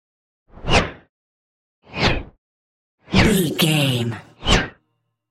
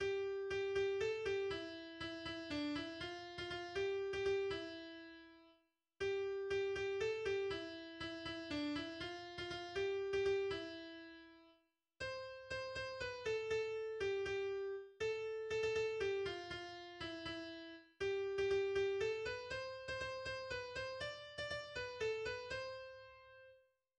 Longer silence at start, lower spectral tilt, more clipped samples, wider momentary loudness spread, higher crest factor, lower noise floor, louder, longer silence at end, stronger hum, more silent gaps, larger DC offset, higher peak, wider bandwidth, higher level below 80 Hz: first, 0.55 s vs 0 s; about the same, -4.5 dB/octave vs -4.5 dB/octave; neither; about the same, 13 LU vs 11 LU; first, 22 dB vs 14 dB; second, -72 dBFS vs -77 dBFS; first, -19 LUFS vs -43 LUFS; first, 0.6 s vs 0.4 s; neither; first, 1.09-1.82 s, 2.38-2.98 s vs none; neither; first, 0 dBFS vs -28 dBFS; first, 16 kHz vs 9.4 kHz; first, -32 dBFS vs -68 dBFS